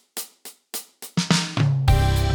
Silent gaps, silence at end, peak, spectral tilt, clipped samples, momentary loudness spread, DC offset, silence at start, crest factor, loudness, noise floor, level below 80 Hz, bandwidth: none; 0 s; -2 dBFS; -5 dB/octave; under 0.1%; 14 LU; under 0.1%; 0.15 s; 20 dB; -22 LUFS; -45 dBFS; -28 dBFS; over 20 kHz